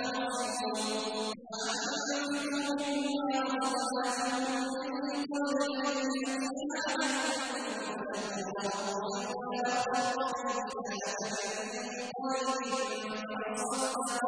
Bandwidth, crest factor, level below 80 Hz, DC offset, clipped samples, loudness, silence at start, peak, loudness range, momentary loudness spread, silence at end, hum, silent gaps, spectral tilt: 10.5 kHz; 14 dB; -76 dBFS; under 0.1%; under 0.1%; -33 LUFS; 0 s; -18 dBFS; 2 LU; 5 LU; 0 s; none; none; -2.5 dB/octave